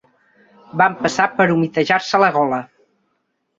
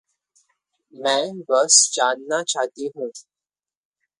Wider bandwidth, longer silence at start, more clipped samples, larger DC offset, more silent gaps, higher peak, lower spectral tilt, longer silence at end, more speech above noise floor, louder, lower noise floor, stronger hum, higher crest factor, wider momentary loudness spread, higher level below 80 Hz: second, 8 kHz vs 11.5 kHz; second, 0.75 s vs 1 s; neither; neither; neither; about the same, 0 dBFS vs 0 dBFS; first, -5 dB/octave vs 0 dB/octave; about the same, 0.95 s vs 1 s; second, 53 dB vs over 69 dB; about the same, -17 LUFS vs -19 LUFS; second, -70 dBFS vs under -90 dBFS; neither; about the same, 18 dB vs 22 dB; second, 6 LU vs 16 LU; first, -60 dBFS vs -80 dBFS